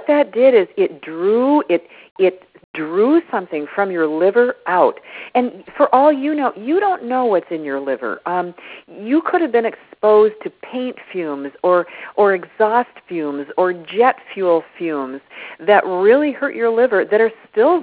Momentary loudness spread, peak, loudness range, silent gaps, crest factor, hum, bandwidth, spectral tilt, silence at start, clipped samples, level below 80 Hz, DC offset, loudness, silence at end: 12 LU; 0 dBFS; 3 LU; 2.11-2.16 s, 2.64-2.74 s; 16 dB; none; 4 kHz; -9.5 dB/octave; 0 s; under 0.1%; -66 dBFS; under 0.1%; -17 LUFS; 0 s